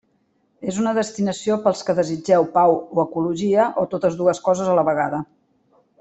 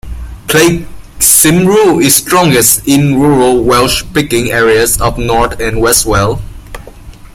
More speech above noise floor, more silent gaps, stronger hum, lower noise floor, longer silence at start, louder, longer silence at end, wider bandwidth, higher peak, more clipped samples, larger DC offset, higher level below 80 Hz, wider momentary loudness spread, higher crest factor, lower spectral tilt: first, 46 dB vs 22 dB; neither; neither; first, -65 dBFS vs -30 dBFS; first, 0.6 s vs 0.05 s; second, -20 LUFS vs -8 LUFS; first, 0.75 s vs 0.2 s; second, 8.2 kHz vs over 20 kHz; second, -4 dBFS vs 0 dBFS; second, under 0.1% vs 0.3%; neither; second, -62 dBFS vs -26 dBFS; about the same, 6 LU vs 7 LU; first, 16 dB vs 10 dB; first, -6 dB/octave vs -3.5 dB/octave